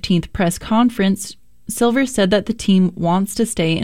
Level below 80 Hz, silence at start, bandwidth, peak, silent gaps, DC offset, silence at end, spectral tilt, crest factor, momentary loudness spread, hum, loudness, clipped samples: -42 dBFS; 0.05 s; 16 kHz; -2 dBFS; none; 1%; 0 s; -5.5 dB/octave; 16 dB; 7 LU; none; -17 LUFS; under 0.1%